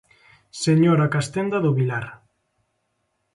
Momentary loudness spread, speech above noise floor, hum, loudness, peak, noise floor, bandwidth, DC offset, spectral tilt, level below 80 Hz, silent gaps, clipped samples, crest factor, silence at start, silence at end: 15 LU; 53 dB; none; -21 LUFS; -6 dBFS; -73 dBFS; 11.5 kHz; under 0.1%; -6.5 dB/octave; -62 dBFS; none; under 0.1%; 16 dB; 0.55 s; 1.2 s